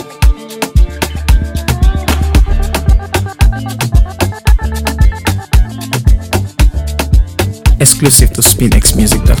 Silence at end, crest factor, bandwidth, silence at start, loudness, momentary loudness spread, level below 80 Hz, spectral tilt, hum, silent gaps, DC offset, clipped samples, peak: 0 s; 10 dB; over 20 kHz; 0 s; -11 LUFS; 9 LU; -12 dBFS; -4 dB/octave; none; none; under 0.1%; 0.8%; 0 dBFS